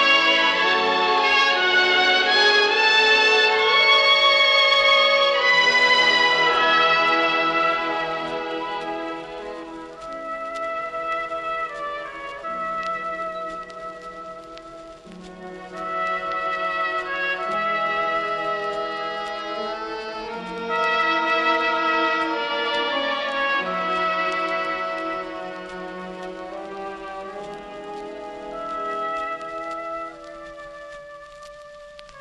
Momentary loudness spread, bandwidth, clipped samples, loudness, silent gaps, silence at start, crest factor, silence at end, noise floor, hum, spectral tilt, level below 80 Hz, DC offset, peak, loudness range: 20 LU; 10.5 kHz; under 0.1%; -19 LUFS; none; 0 s; 16 dB; 0 s; -42 dBFS; none; -2 dB/octave; -58 dBFS; under 0.1%; -6 dBFS; 16 LU